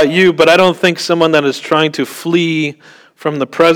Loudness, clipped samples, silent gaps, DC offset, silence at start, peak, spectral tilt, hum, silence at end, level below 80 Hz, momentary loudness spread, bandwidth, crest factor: -12 LUFS; under 0.1%; none; under 0.1%; 0 s; 0 dBFS; -5 dB/octave; none; 0 s; -54 dBFS; 11 LU; 18.5 kHz; 12 dB